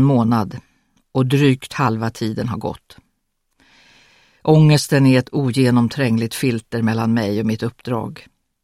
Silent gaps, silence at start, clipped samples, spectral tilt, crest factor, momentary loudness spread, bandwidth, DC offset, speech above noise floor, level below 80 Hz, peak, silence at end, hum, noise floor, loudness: none; 0 s; under 0.1%; -6.5 dB/octave; 18 dB; 12 LU; 15.5 kHz; under 0.1%; 53 dB; -52 dBFS; 0 dBFS; 0.45 s; none; -70 dBFS; -18 LUFS